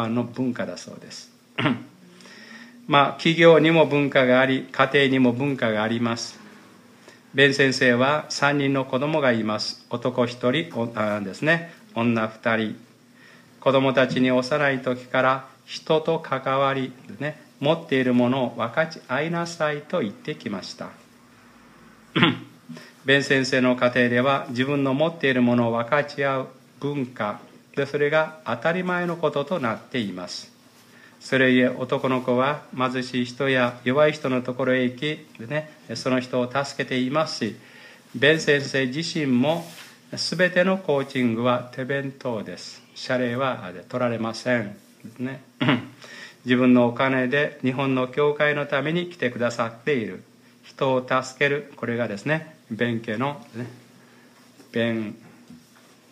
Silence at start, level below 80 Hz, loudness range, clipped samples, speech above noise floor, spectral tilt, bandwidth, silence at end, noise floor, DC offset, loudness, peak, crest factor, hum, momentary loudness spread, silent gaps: 0 s; -70 dBFS; 6 LU; under 0.1%; 30 dB; -5.5 dB/octave; 12.5 kHz; 0.55 s; -53 dBFS; under 0.1%; -23 LUFS; 0 dBFS; 24 dB; none; 15 LU; none